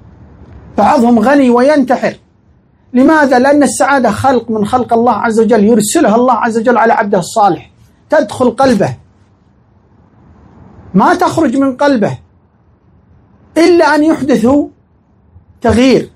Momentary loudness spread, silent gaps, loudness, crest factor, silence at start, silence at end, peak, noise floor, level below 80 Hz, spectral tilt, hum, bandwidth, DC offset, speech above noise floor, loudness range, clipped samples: 7 LU; none; -10 LUFS; 10 dB; 0.4 s; 0.1 s; 0 dBFS; -49 dBFS; -44 dBFS; -5.5 dB/octave; none; 15 kHz; under 0.1%; 40 dB; 5 LU; 0.3%